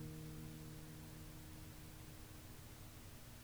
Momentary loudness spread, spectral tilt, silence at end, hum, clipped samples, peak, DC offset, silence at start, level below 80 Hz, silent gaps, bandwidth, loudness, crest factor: 4 LU; -5 dB/octave; 0 s; none; under 0.1%; -40 dBFS; under 0.1%; 0 s; -62 dBFS; none; over 20 kHz; -55 LUFS; 14 dB